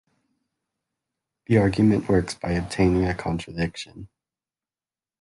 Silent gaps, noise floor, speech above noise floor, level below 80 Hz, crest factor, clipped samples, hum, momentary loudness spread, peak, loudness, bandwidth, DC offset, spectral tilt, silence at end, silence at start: none; under -90 dBFS; over 68 dB; -42 dBFS; 18 dB; under 0.1%; none; 10 LU; -6 dBFS; -23 LUFS; 11.5 kHz; under 0.1%; -7 dB/octave; 1.15 s; 1.5 s